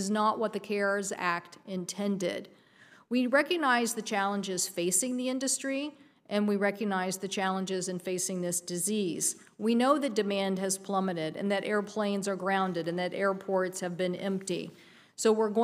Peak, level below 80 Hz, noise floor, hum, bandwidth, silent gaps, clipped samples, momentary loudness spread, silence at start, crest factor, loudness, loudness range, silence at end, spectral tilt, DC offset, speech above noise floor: -12 dBFS; -82 dBFS; -59 dBFS; none; 15.5 kHz; none; under 0.1%; 7 LU; 0 s; 18 dB; -30 LUFS; 2 LU; 0 s; -3.5 dB/octave; under 0.1%; 28 dB